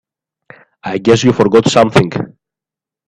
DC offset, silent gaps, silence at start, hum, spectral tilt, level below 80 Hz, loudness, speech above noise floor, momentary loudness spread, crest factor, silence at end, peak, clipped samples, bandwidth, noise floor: under 0.1%; none; 0.85 s; none; -5.5 dB/octave; -46 dBFS; -11 LUFS; 77 dB; 15 LU; 14 dB; 0.8 s; 0 dBFS; under 0.1%; 11 kHz; -87 dBFS